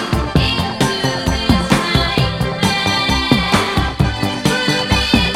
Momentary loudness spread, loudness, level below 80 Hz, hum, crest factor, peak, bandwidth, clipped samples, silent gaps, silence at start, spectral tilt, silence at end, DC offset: 4 LU; -15 LUFS; -26 dBFS; none; 16 dB; 0 dBFS; 16.5 kHz; under 0.1%; none; 0 s; -4.5 dB/octave; 0 s; under 0.1%